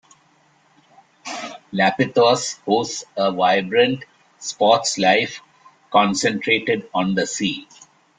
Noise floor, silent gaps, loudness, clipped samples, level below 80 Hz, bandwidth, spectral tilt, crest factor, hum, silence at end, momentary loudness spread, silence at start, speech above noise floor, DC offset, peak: -58 dBFS; none; -19 LUFS; under 0.1%; -62 dBFS; 9.6 kHz; -3.5 dB/octave; 18 dB; none; 0.55 s; 14 LU; 1.25 s; 39 dB; under 0.1%; -2 dBFS